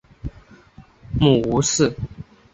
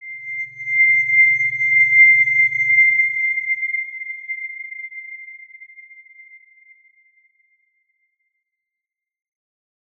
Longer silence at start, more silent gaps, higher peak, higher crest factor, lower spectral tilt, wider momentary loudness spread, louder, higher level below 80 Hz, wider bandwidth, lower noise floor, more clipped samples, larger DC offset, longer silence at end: first, 0.25 s vs 0 s; neither; about the same, -2 dBFS vs -4 dBFS; about the same, 20 dB vs 16 dB; first, -5 dB/octave vs -2.5 dB/octave; about the same, 20 LU vs 21 LU; second, -19 LUFS vs -14 LUFS; first, -38 dBFS vs -78 dBFS; first, 8.4 kHz vs 6.6 kHz; second, -48 dBFS vs -86 dBFS; neither; neither; second, 0.3 s vs 4.2 s